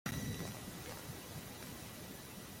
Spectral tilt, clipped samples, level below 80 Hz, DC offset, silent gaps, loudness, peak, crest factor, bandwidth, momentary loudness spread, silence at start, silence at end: -4 dB/octave; under 0.1%; -62 dBFS; under 0.1%; none; -46 LUFS; -26 dBFS; 20 dB; 16.5 kHz; 7 LU; 0.05 s; 0 s